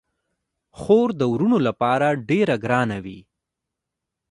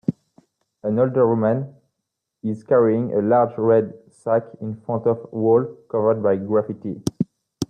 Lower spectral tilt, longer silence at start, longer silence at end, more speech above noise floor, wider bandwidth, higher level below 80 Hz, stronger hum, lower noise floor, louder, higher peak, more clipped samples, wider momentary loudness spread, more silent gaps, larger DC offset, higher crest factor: about the same, -7.5 dB/octave vs -8 dB/octave; first, 0.8 s vs 0.1 s; first, 1.1 s vs 0.05 s; about the same, 63 dB vs 60 dB; first, 11.5 kHz vs 9.8 kHz; about the same, -56 dBFS vs -60 dBFS; neither; about the same, -83 dBFS vs -80 dBFS; about the same, -20 LUFS vs -21 LUFS; about the same, -4 dBFS vs -6 dBFS; neither; about the same, 11 LU vs 12 LU; neither; neither; about the same, 18 dB vs 16 dB